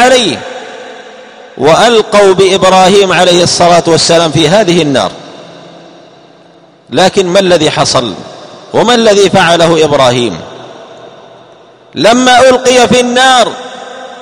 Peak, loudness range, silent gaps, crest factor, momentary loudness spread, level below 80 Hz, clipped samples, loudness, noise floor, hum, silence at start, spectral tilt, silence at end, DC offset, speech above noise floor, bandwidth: 0 dBFS; 6 LU; none; 8 dB; 19 LU; -42 dBFS; 3%; -6 LUFS; -40 dBFS; none; 0 s; -3.5 dB/octave; 0 s; under 0.1%; 34 dB; 16.5 kHz